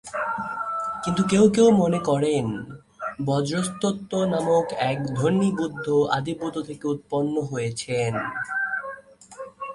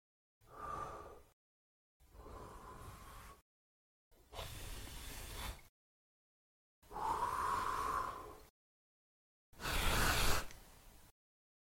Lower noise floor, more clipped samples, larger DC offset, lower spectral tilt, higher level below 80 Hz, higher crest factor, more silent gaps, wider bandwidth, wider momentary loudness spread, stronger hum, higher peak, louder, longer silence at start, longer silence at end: second, -43 dBFS vs -61 dBFS; neither; neither; first, -6 dB/octave vs -3 dB/octave; second, -56 dBFS vs -50 dBFS; second, 18 dB vs 24 dB; second, none vs 1.33-2.00 s, 3.42-4.11 s, 5.69-6.82 s, 8.50-9.53 s; second, 11.5 kHz vs 16.5 kHz; second, 12 LU vs 23 LU; neither; first, -6 dBFS vs -18 dBFS; first, -24 LUFS vs -40 LUFS; second, 0.05 s vs 0.5 s; second, 0 s vs 0.7 s